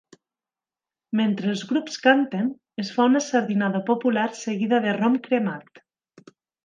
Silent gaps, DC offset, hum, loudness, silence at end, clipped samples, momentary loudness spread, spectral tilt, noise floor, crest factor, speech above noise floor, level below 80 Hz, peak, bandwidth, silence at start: none; under 0.1%; none; -23 LUFS; 0.9 s; under 0.1%; 9 LU; -5.5 dB/octave; under -90 dBFS; 22 dB; over 68 dB; -76 dBFS; -2 dBFS; 9.2 kHz; 1.1 s